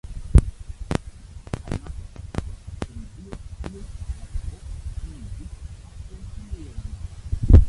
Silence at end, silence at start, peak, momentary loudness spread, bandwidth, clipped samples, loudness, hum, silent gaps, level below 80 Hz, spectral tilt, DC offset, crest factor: 0 s; 0.05 s; -2 dBFS; 20 LU; 11.5 kHz; under 0.1%; -29 LUFS; none; none; -26 dBFS; -7.5 dB/octave; under 0.1%; 22 dB